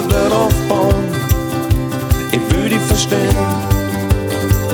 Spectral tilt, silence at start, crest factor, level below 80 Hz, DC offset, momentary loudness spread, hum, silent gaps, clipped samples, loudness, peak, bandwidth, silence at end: -5.5 dB/octave; 0 s; 14 dB; -22 dBFS; under 0.1%; 3 LU; none; none; under 0.1%; -15 LUFS; 0 dBFS; over 20 kHz; 0 s